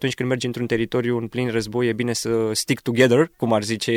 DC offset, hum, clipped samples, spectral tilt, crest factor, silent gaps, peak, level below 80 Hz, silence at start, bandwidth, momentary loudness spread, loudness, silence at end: under 0.1%; none; under 0.1%; -5 dB/octave; 18 dB; none; -4 dBFS; -54 dBFS; 0 s; 16.5 kHz; 7 LU; -21 LUFS; 0 s